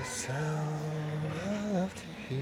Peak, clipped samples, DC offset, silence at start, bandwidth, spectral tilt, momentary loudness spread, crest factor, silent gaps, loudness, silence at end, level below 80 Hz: -20 dBFS; under 0.1%; under 0.1%; 0 s; 15 kHz; -5.5 dB/octave; 5 LU; 14 dB; none; -35 LUFS; 0 s; -60 dBFS